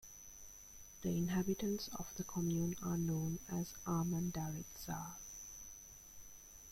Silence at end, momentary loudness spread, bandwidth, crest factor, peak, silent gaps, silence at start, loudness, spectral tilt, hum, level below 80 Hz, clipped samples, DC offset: 0 s; 17 LU; 16.5 kHz; 16 dB; -26 dBFS; none; 0 s; -41 LUFS; -5.5 dB/octave; none; -62 dBFS; under 0.1%; under 0.1%